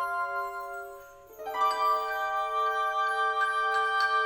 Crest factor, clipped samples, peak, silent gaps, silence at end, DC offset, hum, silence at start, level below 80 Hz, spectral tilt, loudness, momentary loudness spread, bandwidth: 14 dB; under 0.1%; -16 dBFS; none; 0 s; under 0.1%; none; 0 s; -66 dBFS; -0.5 dB/octave; -28 LUFS; 14 LU; over 20 kHz